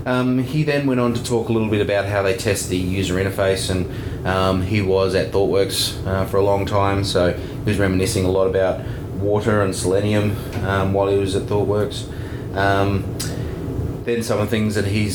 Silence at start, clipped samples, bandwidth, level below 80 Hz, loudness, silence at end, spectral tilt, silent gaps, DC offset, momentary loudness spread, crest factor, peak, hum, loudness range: 0 s; under 0.1%; 20 kHz; -38 dBFS; -20 LUFS; 0 s; -5.5 dB/octave; none; under 0.1%; 7 LU; 16 dB; -2 dBFS; none; 2 LU